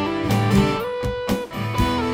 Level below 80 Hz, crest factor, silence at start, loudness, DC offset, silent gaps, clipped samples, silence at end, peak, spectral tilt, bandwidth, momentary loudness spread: -34 dBFS; 16 dB; 0 s; -22 LUFS; under 0.1%; none; under 0.1%; 0 s; -4 dBFS; -6.5 dB/octave; 18 kHz; 7 LU